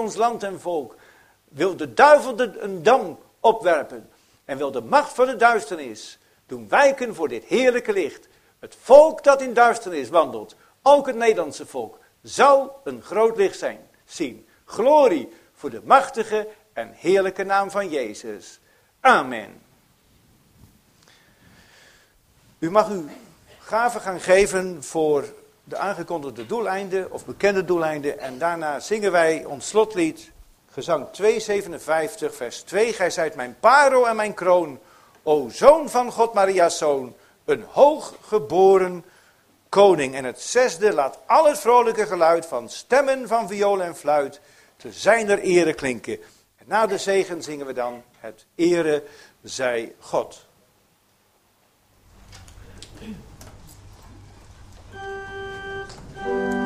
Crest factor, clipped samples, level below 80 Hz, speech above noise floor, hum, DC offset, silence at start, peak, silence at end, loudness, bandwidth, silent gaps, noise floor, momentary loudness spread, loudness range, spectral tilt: 22 dB; under 0.1%; -56 dBFS; 42 dB; none; under 0.1%; 0 s; 0 dBFS; 0 s; -20 LUFS; 15.5 kHz; none; -62 dBFS; 18 LU; 8 LU; -4 dB/octave